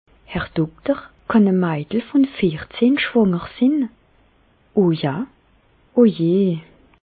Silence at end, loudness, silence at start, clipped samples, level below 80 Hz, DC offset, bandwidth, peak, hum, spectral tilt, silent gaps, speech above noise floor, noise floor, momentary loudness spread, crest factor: 0.45 s; -19 LUFS; 0.3 s; under 0.1%; -50 dBFS; under 0.1%; 4.8 kHz; -4 dBFS; none; -12 dB/octave; none; 39 dB; -57 dBFS; 10 LU; 16 dB